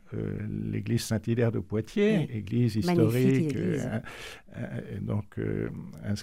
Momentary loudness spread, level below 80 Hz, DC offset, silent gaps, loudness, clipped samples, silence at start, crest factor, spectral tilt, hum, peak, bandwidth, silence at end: 13 LU; -54 dBFS; 0.2%; none; -29 LUFS; under 0.1%; 0.1 s; 18 dB; -7 dB/octave; none; -10 dBFS; 16 kHz; 0 s